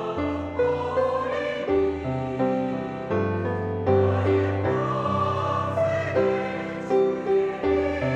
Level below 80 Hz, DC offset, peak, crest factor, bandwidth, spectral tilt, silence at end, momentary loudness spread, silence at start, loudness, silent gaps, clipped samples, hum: -48 dBFS; under 0.1%; -8 dBFS; 16 dB; 8.2 kHz; -8 dB/octave; 0 s; 6 LU; 0 s; -25 LUFS; none; under 0.1%; none